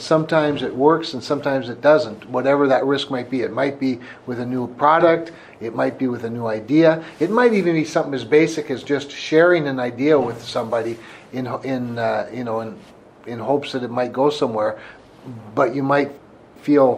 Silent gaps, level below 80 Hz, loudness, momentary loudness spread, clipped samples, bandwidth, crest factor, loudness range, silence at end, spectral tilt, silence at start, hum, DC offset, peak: none; -62 dBFS; -20 LUFS; 13 LU; under 0.1%; 10.5 kHz; 18 dB; 6 LU; 0 s; -6 dB/octave; 0 s; none; under 0.1%; -2 dBFS